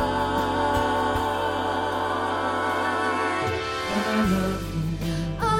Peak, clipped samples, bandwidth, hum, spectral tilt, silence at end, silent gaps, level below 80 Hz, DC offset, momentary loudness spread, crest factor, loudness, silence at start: -10 dBFS; under 0.1%; 16.5 kHz; none; -5.5 dB/octave; 0 s; none; -40 dBFS; under 0.1%; 5 LU; 14 dB; -25 LUFS; 0 s